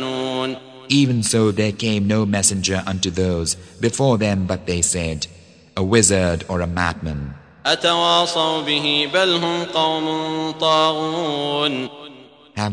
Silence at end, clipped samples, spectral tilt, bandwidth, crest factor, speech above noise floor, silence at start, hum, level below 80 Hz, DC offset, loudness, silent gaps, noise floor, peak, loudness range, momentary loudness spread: 0 s; under 0.1%; -3.5 dB/octave; 10.5 kHz; 20 dB; 24 dB; 0 s; none; -44 dBFS; under 0.1%; -19 LUFS; none; -43 dBFS; 0 dBFS; 2 LU; 11 LU